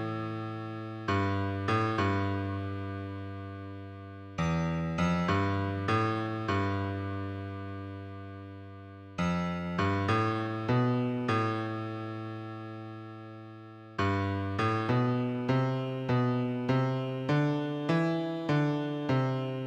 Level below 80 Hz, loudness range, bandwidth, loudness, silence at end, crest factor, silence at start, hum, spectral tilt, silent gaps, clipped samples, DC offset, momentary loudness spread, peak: -60 dBFS; 5 LU; 8.6 kHz; -31 LUFS; 0 s; 16 dB; 0 s; none; -7.5 dB/octave; none; under 0.1%; under 0.1%; 15 LU; -16 dBFS